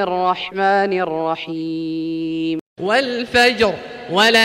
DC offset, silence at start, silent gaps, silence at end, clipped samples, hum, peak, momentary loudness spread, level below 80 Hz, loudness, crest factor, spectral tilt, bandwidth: under 0.1%; 0 s; 2.61-2.76 s; 0 s; under 0.1%; none; -4 dBFS; 10 LU; -52 dBFS; -18 LUFS; 14 dB; -4 dB/octave; 16 kHz